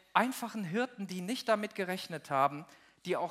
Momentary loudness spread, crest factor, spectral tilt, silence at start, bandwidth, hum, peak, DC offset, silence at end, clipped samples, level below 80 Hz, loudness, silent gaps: 8 LU; 26 dB; -4.5 dB/octave; 0.15 s; 16 kHz; none; -8 dBFS; under 0.1%; 0 s; under 0.1%; -84 dBFS; -34 LUFS; none